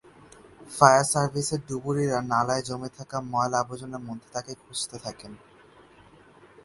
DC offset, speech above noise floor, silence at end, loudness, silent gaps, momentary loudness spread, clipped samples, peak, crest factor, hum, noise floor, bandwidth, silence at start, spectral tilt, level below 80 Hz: under 0.1%; 28 dB; 1.3 s; -26 LUFS; none; 19 LU; under 0.1%; 0 dBFS; 26 dB; none; -54 dBFS; 11.5 kHz; 0.6 s; -4 dB/octave; -62 dBFS